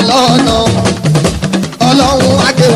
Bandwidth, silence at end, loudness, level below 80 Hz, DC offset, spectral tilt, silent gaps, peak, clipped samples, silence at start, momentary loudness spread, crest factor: 15.5 kHz; 0 s; -9 LUFS; -28 dBFS; under 0.1%; -5 dB/octave; none; 0 dBFS; 0.4%; 0 s; 5 LU; 8 dB